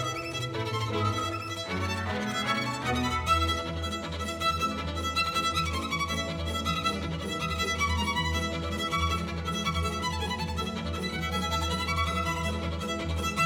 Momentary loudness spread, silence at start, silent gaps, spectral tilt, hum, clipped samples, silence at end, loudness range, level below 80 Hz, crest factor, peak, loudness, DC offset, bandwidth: 5 LU; 0 s; none; -4 dB/octave; none; under 0.1%; 0 s; 2 LU; -44 dBFS; 18 dB; -12 dBFS; -29 LUFS; under 0.1%; 18 kHz